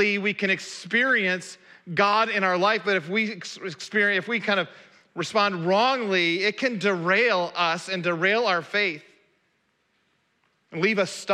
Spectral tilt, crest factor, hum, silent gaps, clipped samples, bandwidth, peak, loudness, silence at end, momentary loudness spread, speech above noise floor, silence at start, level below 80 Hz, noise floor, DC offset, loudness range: -4 dB/octave; 18 dB; none; none; under 0.1%; 12.5 kHz; -8 dBFS; -23 LUFS; 0 s; 10 LU; 46 dB; 0 s; -80 dBFS; -70 dBFS; under 0.1%; 4 LU